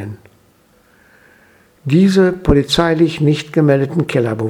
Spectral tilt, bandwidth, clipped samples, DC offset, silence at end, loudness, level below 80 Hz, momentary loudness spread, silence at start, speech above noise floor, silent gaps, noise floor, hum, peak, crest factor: -6.5 dB/octave; 13.5 kHz; under 0.1%; under 0.1%; 0 s; -14 LUFS; -34 dBFS; 5 LU; 0 s; 39 dB; none; -52 dBFS; none; 0 dBFS; 16 dB